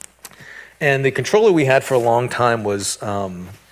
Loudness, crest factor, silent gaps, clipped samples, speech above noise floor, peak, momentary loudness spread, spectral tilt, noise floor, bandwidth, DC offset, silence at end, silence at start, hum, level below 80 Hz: -17 LUFS; 16 dB; none; under 0.1%; 24 dB; -2 dBFS; 22 LU; -5 dB/octave; -41 dBFS; 16 kHz; under 0.1%; 0.15 s; 0.25 s; none; -52 dBFS